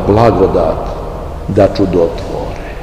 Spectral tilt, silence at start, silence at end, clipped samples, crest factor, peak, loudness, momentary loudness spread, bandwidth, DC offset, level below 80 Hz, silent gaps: -8 dB/octave; 0 s; 0 s; 0.7%; 12 dB; 0 dBFS; -13 LUFS; 14 LU; 15.5 kHz; 0.9%; -24 dBFS; none